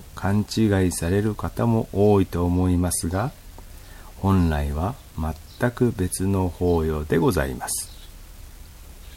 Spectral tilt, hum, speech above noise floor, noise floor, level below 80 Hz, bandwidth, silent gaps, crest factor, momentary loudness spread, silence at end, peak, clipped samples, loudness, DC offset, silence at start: -6 dB/octave; none; 20 dB; -42 dBFS; -36 dBFS; 16.5 kHz; none; 16 dB; 10 LU; 0 s; -6 dBFS; under 0.1%; -23 LUFS; under 0.1%; 0 s